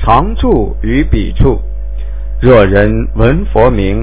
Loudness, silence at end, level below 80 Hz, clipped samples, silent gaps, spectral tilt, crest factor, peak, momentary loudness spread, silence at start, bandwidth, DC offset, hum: -11 LUFS; 0 s; -16 dBFS; 2%; none; -11.5 dB/octave; 10 dB; 0 dBFS; 16 LU; 0 s; 4 kHz; 10%; none